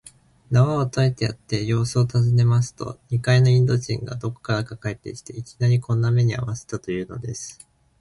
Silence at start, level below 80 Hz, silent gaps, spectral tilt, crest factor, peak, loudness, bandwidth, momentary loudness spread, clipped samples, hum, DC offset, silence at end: 0.5 s; -50 dBFS; none; -6.5 dB/octave; 16 dB; -6 dBFS; -22 LUFS; 11.5 kHz; 14 LU; under 0.1%; none; under 0.1%; 0.45 s